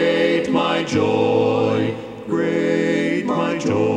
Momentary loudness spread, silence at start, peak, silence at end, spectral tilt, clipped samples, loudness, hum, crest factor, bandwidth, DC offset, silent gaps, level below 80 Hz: 5 LU; 0 s; -4 dBFS; 0 s; -6 dB/octave; under 0.1%; -19 LUFS; none; 14 dB; 10 kHz; under 0.1%; none; -58 dBFS